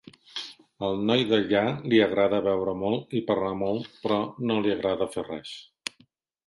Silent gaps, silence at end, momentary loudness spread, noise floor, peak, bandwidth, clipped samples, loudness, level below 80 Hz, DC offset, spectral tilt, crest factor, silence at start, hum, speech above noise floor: none; 0.85 s; 15 LU; -63 dBFS; -8 dBFS; 11.5 kHz; under 0.1%; -26 LUFS; -60 dBFS; under 0.1%; -6 dB/octave; 20 dB; 0.35 s; none; 38 dB